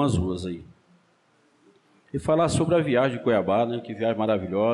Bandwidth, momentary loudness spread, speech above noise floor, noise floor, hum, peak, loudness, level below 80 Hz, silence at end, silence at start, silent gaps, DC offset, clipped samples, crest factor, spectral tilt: 11.5 kHz; 11 LU; 40 dB; -63 dBFS; none; -12 dBFS; -24 LUFS; -50 dBFS; 0 s; 0 s; none; under 0.1%; under 0.1%; 12 dB; -6.5 dB/octave